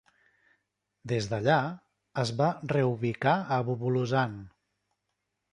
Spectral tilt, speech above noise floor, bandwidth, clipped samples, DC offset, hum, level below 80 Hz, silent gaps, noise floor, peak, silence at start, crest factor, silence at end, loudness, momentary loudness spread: -6.5 dB/octave; 54 dB; 10.5 kHz; under 0.1%; under 0.1%; 50 Hz at -65 dBFS; -64 dBFS; none; -82 dBFS; -10 dBFS; 1.05 s; 20 dB; 1.05 s; -29 LUFS; 12 LU